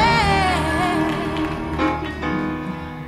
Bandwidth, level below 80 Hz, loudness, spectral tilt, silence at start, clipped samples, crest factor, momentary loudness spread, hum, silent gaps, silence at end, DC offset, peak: 15 kHz; -34 dBFS; -21 LUFS; -5.5 dB/octave; 0 s; under 0.1%; 16 dB; 9 LU; none; none; 0 s; under 0.1%; -6 dBFS